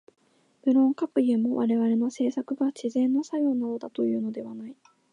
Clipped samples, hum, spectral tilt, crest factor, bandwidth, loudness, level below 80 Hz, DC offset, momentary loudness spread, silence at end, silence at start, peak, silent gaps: under 0.1%; none; -7 dB/octave; 14 dB; 10 kHz; -26 LUFS; -82 dBFS; under 0.1%; 10 LU; 0.4 s; 0.65 s; -12 dBFS; none